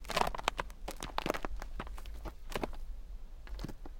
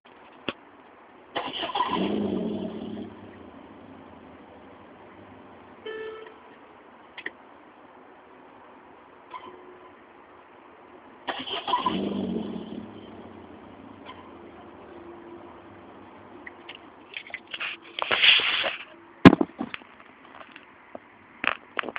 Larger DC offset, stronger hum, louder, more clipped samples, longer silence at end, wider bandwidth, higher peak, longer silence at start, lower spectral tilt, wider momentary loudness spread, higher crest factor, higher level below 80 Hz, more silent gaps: neither; neither; second, -40 LUFS vs -25 LUFS; neither; about the same, 0 s vs 0 s; first, 17 kHz vs 4 kHz; second, -8 dBFS vs 0 dBFS; second, 0 s vs 0.45 s; about the same, -3.5 dB/octave vs -3 dB/octave; second, 16 LU vs 24 LU; about the same, 32 dB vs 30 dB; first, -44 dBFS vs -56 dBFS; neither